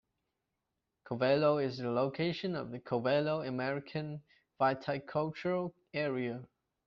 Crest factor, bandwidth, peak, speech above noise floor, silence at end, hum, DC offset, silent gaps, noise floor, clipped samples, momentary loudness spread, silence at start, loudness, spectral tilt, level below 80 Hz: 18 dB; 6.8 kHz; -16 dBFS; 53 dB; 0.4 s; none; under 0.1%; none; -86 dBFS; under 0.1%; 10 LU; 1.05 s; -34 LUFS; -5 dB/octave; -72 dBFS